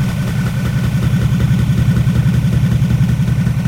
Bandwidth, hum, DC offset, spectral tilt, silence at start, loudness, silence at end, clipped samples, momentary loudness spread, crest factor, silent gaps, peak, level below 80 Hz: 16 kHz; none; under 0.1%; -7.5 dB/octave; 0 s; -15 LUFS; 0 s; under 0.1%; 4 LU; 10 dB; none; -2 dBFS; -26 dBFS